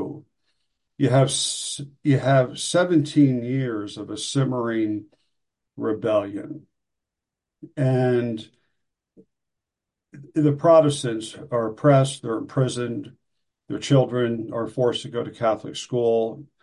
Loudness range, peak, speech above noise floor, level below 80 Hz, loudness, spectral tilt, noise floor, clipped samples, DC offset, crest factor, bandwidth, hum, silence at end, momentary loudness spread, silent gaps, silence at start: 7 LU; -4 dBFS; 64 dB; -62 dBFS; -22 LUFS; -6 dB/octave; -86 dBFS; under 0.1%; under 0.1%; 18 dB; 11.5 kHz; none; 0.2 s; 13 LU; none; 0 s